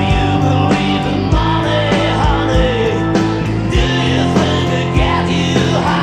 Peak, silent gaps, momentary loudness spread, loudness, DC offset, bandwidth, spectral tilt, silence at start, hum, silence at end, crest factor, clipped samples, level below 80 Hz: -2 dBFS; none; 2 LU; -14 LUFS; under 0.1%; 10.5 kHz; -6 dB/octave; 0 s; none; 0 s; 12 dB; under 0.1%; -24 dBFS